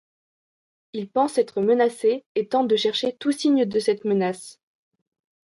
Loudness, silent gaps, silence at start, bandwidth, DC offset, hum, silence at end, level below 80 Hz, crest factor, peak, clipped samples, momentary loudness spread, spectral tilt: -22 LUFS; 2.26-2.35 s; 0.95 s; 11.5 kHz; under 0.1%; none; 0.95 s; -72 dBFS; 16 dB; -8 dBFS; under 0.1%; 9 LU; -5 dB/octave